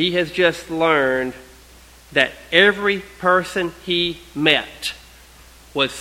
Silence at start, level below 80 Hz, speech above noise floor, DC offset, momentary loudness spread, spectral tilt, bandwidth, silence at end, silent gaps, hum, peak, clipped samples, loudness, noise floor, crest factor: 0 s; -50 dBFS; 27 dB; under 0.1%; 13 LU; -4 dB/octave; 16.5 kHz; 0 s; none; none; 0 dBFS; under 0.1%; -19 LUFS; -46 dBFS; 20 dB